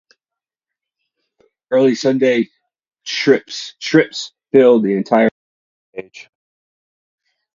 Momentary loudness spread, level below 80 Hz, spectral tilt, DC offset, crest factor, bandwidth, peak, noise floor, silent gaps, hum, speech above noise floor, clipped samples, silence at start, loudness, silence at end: 20 LU; -66 dBFS; -5 dB/octave; under 0.1%; 18 dB; 7.6 kHz; 0 dBFS; -87 dBFS; 5.31-5.93 s; none; 72 dB; under 0.1%; 1.7 s; -15 LUFS; 1.35 s